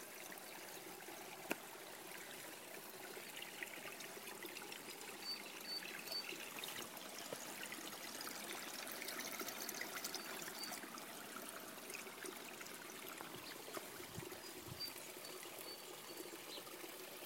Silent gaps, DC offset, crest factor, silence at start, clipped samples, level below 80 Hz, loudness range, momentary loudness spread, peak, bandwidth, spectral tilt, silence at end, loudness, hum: none; under 0.1%; 28 dB; 0 s; under 0.1%; -84 dBFS; 4 LU; 6 LU; -22 dBFS; 16.5 kHz; -1.5 dB/octave; 0 s; -48 LUFS; none